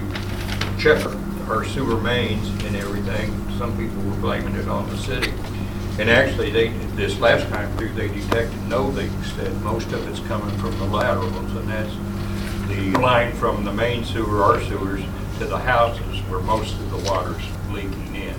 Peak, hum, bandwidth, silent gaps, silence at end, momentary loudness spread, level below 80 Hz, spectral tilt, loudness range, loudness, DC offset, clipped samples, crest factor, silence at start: -2 dBFS; none; 19 kHz; none; 0 s; 10 LU; -32 dBFS; -6 dB/octave; 4 LU; -22 LUFS; under 0.1%; under 0.1%; 20 dB; 0 s